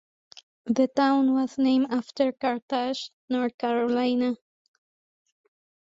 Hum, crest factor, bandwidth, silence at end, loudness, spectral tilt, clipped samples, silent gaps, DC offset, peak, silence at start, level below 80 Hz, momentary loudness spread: none; 16 dB; 7.8 kHz; 1.6 s; -25 LUFS; -5 dB/octave; under 0.1%; 2.62-2.68 s, 3.13-3.28 s, 3.54-3.59 s; under 0.1%; -10 dBFS; 0.65 s; -70 dBFS; 9 LU